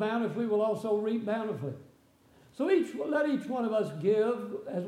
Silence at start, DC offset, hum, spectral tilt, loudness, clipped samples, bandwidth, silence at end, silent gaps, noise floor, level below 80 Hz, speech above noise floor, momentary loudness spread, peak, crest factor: 0 s; under 0.1%; none; -7 dB/octave; -30 LUFS; under 0.1%; 12.5 kHz; 0 s; none; -62 dBFS; -78 dBFS; 32 dB; 8 LU; -16 dBFS; 16 dB